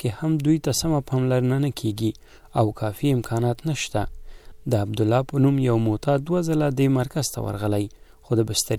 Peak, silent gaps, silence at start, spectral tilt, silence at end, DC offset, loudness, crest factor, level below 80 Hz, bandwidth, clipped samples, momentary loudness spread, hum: -8 dBFS; none; 0 s; -6 dB/octave; 0 s; under 0.1%; -23 LUFS; 14 dB; -44 dBFS; 15.5 kHz; under 0.1%; 7 LU; none